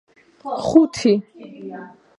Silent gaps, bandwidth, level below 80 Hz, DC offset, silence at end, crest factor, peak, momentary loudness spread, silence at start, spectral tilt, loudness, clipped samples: none; 11 kHz; -56 dBFS; under 0.1%; 0.3 s; 20 dB; 0 dBFS; 21 LU; 0.45 s; -6 dB/octave; -18 LUFS; under 0.1%